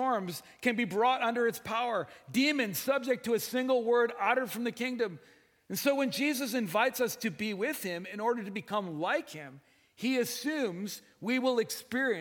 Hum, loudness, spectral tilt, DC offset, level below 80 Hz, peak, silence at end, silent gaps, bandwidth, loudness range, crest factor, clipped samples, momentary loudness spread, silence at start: none; -31 LUFS; -4 dB/octave; under 0.1%; -78 dBFS; -14 dBFS; 0 s; none; 18 kHz; 4 LU; 18 dB; under 0.1%; 8 LU; 0 s